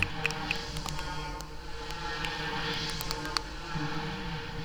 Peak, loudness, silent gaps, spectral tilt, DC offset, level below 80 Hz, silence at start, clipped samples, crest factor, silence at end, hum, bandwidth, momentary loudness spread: -8 dBFS; -34 LUFS; none; -3.5 dB/octave; under 0.1%; -44 dBFS; 0 s; under 0.1%; 26 dB; 0 s; none; over 20 kHz; 7 LU